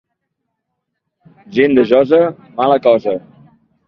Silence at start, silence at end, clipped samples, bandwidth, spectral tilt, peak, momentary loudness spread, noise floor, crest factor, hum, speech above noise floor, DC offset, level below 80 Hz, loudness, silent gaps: 1.5 s; 0.7 s; under 0.1%; 6 kHz; -8 dB/octave; 0 dBFS; 11 LU; -74 dBFS; 16 dB; none; 62 dB; under 0.1%; -58 dBFS; -13 LUFS; none